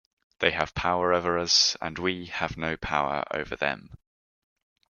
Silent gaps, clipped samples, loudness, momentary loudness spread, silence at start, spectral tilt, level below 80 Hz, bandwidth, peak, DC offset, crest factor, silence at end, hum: none; under 0.1%; -26 LUFS; 11 LU; 0.4 s; -2.5 dB/octave; -52 dBFS; 12 kHz; -4 dBFS; under 0.1%; 26 dB; 1 s; none